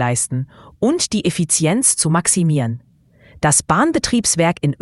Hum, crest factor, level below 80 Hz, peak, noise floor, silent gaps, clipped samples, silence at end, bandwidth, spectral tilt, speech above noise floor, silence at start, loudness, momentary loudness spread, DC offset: none; 18 dB; -46 dBFS; 0 dBFS; -50 dBFS; none; under 0.1%; 0.1 s; 12 kHz; -4 dB/octave; 33 dB; 0 s; -16 LUFS; 8 LU; under 0.1%